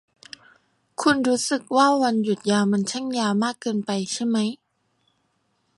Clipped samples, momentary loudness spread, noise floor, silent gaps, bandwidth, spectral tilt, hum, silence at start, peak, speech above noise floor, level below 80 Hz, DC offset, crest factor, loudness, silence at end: under 0.1%; 22 LU; -70 dBFS; none; 11.5 kHz; -4.5 dB/octave; none; 1 s; -6 dBFS; 48 dB; -66 dBFS; under 0.1%; 18 dB; -22 LUFS; 1.25 s